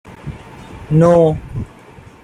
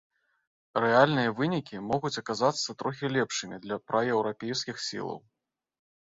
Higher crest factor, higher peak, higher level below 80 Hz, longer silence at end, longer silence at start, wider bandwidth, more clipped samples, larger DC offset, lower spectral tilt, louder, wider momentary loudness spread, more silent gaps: second, 14 dB vs 22 dB; first, -2 dBFS vs -8 dBFS; first, -38 dBFS vs -68 dBFS; second, 0.6 s vs 0.95 s; second, 0.05 s vs 0.75 s; first, 10 kHz vs 8 kHz; neither; neither; first, -9 dB/octave vs -4.5 dB/octave; first, -13 LUFS vs -29 LUFS; first, 24 LU vs 12 LU; neither